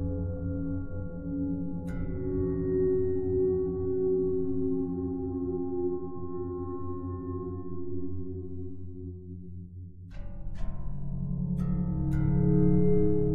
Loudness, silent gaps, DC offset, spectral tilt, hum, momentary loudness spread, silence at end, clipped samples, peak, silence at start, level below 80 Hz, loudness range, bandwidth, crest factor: -31 LUFS; none; under 0.1%; -13 dB/octave; none; 16 LU; 0 s; under 0.1%; -12 dBFS; 0 s; -40 dBFS; 11 LU; 2.3 kHz; 16 dB